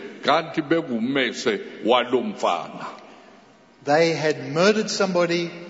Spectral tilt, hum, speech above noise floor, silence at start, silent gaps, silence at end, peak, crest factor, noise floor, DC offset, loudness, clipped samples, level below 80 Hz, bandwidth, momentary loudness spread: -4.5 dB/octave; none; 29 dB; 0 s; none; 0 s; -6 dBFS; 18 dB; -51 dBFS; under 0.1%; -22 LUFS; under 0.1%; -72 dBFS; 8 kHz; 8 LU